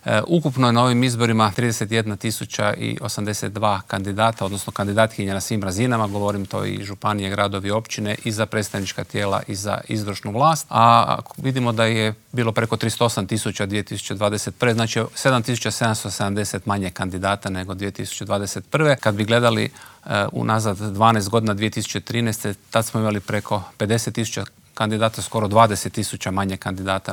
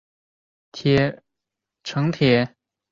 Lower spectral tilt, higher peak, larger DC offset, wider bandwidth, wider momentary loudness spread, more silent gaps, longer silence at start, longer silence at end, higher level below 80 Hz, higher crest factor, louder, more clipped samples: second, -5 dB/octave vs -7 dB/octave; first, 0 dBFS vs -4 dBFS; neither; first, 19 kHz vs 7.4 kHz; second, 9 LU vs 14 LU; neither; second, 0.05 s vs 0.75 s; second, 0 s vs 0.45 s; second, -60 dBFS vs -54 dBFS; about the same, 20 dB vs 18 dB; about the same, -21 LUFS vs -21 LUFS; neither